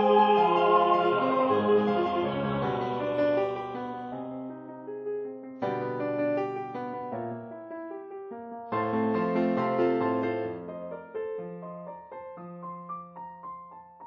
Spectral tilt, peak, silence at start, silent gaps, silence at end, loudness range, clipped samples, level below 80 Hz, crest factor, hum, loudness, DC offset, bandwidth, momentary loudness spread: -5 dB/octave; -10 dBFS; 0 s; none; 0 s; 9 LU; under 0.1%; -66 dBFS; 18 dB; none; -28 LUFS; under 0.1%; 6.2 kHz; 19 LU